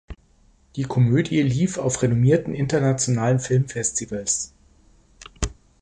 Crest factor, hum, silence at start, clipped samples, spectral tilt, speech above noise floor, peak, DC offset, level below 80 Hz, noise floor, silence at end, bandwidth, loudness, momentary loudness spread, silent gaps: 18 dB; none; 0.1 s; under 0.1%; -5.5 dB/octave; 36 dB; -4 dBFS; under 0.1%; -42 dBFS; -57 dBFS; 0.3 s; 11 kHz; -22 LUFS; 12 LU; none